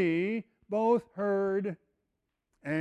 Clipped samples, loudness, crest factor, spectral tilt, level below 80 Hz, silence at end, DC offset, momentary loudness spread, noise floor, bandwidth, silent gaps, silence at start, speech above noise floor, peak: under 0.1%; -31 LUFS; 16 dB; -8.5 dB/octave; -76 dBFS; 0 s; under 0.1%; 12 LU; -83 dBFS; 8.8 kHz; none; 0 s; 54 dB; -16 dBFS